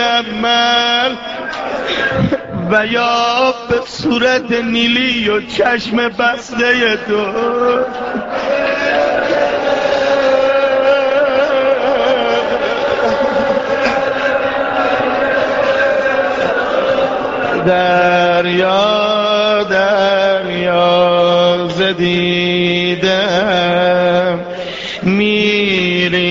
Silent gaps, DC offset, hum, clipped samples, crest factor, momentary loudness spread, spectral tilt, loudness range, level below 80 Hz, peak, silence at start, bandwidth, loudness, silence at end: none; under 0.1%; none; under 0.1%; 14 dB; 5 LU; -2.5 dB/octave; 2 LU; -46 dBFS; 0 dBFS; 0 s; 7.6 kHz; -13 LUFS; 0 s